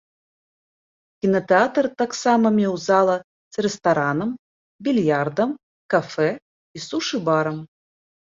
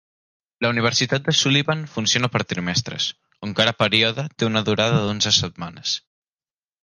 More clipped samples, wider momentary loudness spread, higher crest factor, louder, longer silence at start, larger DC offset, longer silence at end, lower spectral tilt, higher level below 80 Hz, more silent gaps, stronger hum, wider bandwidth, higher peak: neither; first, 12 LU vs 9 LU; about the same, 18 dB vs 20 dB; about the same, -21 LUFS vs -20 LUFS; first, 1.25 s vs 0.6 s; neither; second, 0.65 s vs 0.85 s; first, -5.5 dB/octave vs -3.5 dB/octave; second, -64 dBFS vs -52 dBFS; first, 3.24-3.51 s, 4.39-4.79 s, 5.63-5.89 s, 6.42-6.74 s vs none; neither; second, 7.8 kHz vs 11 kHz; about the same, -4 dBFS vs -2 dBFS